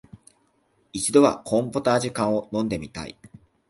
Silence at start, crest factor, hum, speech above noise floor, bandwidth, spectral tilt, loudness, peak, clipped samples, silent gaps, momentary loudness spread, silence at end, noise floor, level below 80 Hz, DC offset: 0.95 s; 22 dB; none; 43 dB; 11.5 kHz; -5 dB/octave; -23 LUFS; -4 dBFS; under 0.1%; none; 18 LU; 0.45 s; -66 dBFS; -54 dBFS; under 0.1%